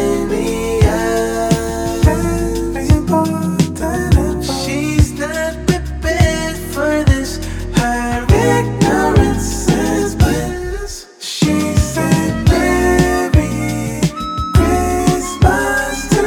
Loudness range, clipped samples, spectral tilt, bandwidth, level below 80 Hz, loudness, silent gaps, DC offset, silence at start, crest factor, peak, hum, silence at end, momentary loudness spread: 2 LU; under 0.1%; -5.5 dB/octave; 19 kHz; -22 dBFS; -15 LUFS; none; under 0.1%; 0 s; 14 dB; 0 dBFS; none; 0 s; 7 LU